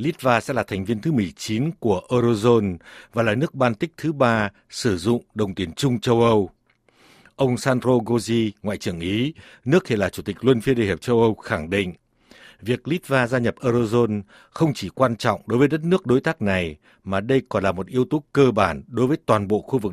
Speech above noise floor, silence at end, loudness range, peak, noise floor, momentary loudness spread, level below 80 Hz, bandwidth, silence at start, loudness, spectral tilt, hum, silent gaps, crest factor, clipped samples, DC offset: 38 dB; 0 s; 2 LU; -2 dBFS; -59 dBFS; 8 LU; -52 dBFS; 14.5 kHz; 0 s; -22 LUFS; -6.5 dB/octave; none; none; 20 dB; under 0.1%; under 0.1%